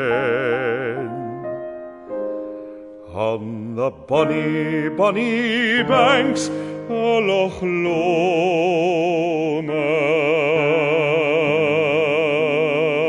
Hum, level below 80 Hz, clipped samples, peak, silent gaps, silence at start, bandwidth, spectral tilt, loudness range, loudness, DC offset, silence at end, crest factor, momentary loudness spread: none; -58 dBFS; under 0.1%; -2 dBFS; none; 0 s; 11 kHz; -5.5 dB/octave; 7 LU; -19 LUFS; under 0.1%; 0 s; 18 dB; 11 LU